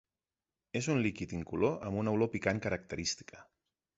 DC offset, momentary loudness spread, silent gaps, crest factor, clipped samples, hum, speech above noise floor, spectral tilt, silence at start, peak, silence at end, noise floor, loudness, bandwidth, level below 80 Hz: under 0.1%; 9 LU; none; 20 dB; under 0.1%; none; over 56 dB; -5 dB/octave; 0.75 s; -14 dBFS; 0.55 s; under -90 dBFS; -34 LUFS; 8.2 kHz; -58 dBFS